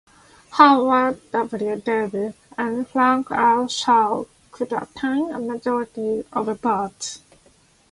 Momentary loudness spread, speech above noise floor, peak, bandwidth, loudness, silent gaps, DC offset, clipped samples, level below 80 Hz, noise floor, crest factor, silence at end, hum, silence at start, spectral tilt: 13 LU; 36 dB; 0 dBFS; 11.5 kHz; -21 LUFS; none; under 0.1%; under 0.1%; -60 dBFS; -56 dBFS; 20 dB; 0.75 s; none; 0.5 s; -4 dB/octave